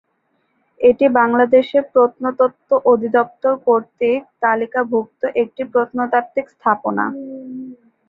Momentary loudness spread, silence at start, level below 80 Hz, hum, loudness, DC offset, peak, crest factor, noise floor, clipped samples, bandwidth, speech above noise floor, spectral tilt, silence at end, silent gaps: 10 LU; 0.8 s; -62 dBFS; none; -17 LUFS; under 0.1%; -2 dBFS; 16 dB; -66 dBFS; under 0.1%; 4.5 kHz; 49 dB; -8 dB/octave; 0.35 s; none